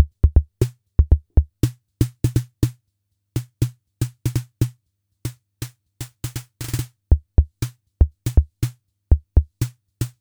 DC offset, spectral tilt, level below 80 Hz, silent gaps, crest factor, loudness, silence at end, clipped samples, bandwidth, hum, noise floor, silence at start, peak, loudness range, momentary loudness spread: under 0.1%; -6.5 dB/octave; -24 dBFS; none; 20 dB; -23 LUFS; 0.1 s; under 0.1%; over 20 kHz; none; -73 dBFS; 0 s; -2 dBFS; 6 LU; 15 LU